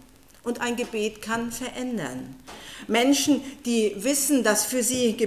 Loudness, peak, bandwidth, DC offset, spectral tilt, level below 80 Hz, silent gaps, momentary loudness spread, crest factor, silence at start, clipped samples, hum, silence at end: -24 LUFS; -8 dBFS; 16 kHz; 0.1%; -2.5 dB/octave; -58 dBFS; none; 16 LU; 16 dB; 0.45 s; under 0.1%; none; 0 s